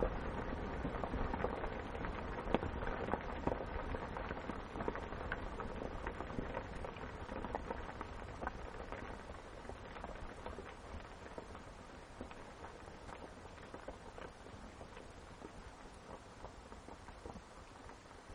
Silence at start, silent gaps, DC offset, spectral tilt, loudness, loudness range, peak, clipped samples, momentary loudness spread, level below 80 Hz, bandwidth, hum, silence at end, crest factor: 0 s; none; under 0.1%; -6.5 dB/octave; -46 LUFS; 11 LU; -14 dBFS; under 0.1%; 13 LU; -50 dBFS; 10.5 kHz; none; 0 s; 32 dB